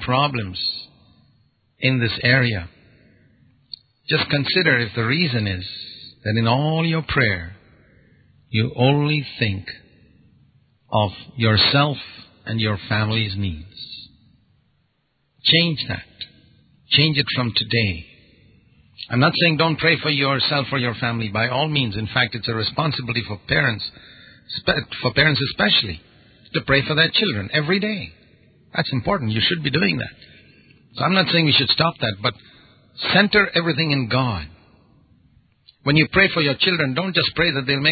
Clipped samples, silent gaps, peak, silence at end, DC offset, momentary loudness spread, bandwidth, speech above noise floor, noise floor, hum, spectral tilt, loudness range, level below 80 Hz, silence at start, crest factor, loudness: under 0.1%; none; 0 dBFS; 0 s; under 0.1%; 16 LU; 4.9 kHz; 48 dB; -68 dBFS; none; -10.5 dB/octave; 4 LU; -46 dBFS; 0 s; 22 dB; -19 LUFS